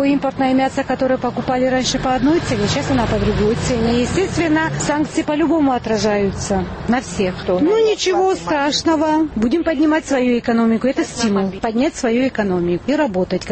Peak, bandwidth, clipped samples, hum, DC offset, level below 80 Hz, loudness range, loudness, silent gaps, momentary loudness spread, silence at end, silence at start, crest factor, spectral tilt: -6 dBFS; 8.8 kHz; under 0.1%; none; under 0.1%; -36 dBFS; 1 LU; -17 LUFS; none; 3 LU; 0 s; 0 s; 12 dB; -5 dB/octave